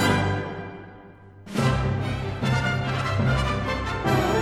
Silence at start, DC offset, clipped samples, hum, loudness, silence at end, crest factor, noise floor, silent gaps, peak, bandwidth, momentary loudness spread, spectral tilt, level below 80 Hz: 0 s; under 0.1%; under 0.1%; none; -25 LUFS; 0 s; 18 dB; -46 dBFS; none; -6 dBFS; 14 kHz; 12 LU; -6 dB/octave; -38 dBFS